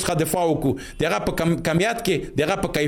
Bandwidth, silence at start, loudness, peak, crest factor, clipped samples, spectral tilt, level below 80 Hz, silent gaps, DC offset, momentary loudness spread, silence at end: 17 kHz; 0 s; -22 LUFS; -8 dBFS; 14 dB; under 0.1%; -5 dB/octave; -42 dBFS; none; under 0.1%; 3 LU; 0 s